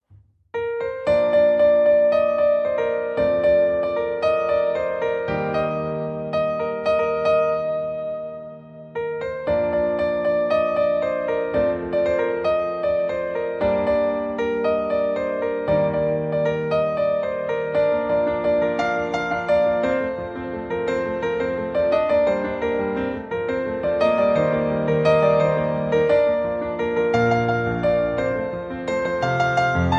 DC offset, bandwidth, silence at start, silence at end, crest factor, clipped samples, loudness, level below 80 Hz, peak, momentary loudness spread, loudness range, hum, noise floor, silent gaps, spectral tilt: under 0.1%; 7.4 kHz; 0.55 s; 0 s; 14 dB; under 0.1%; -21 LUFS; -46 dBFS; -6 dBFS; 8 LU; 4 LU; none; -53 dBFS; none; -7 dB/octave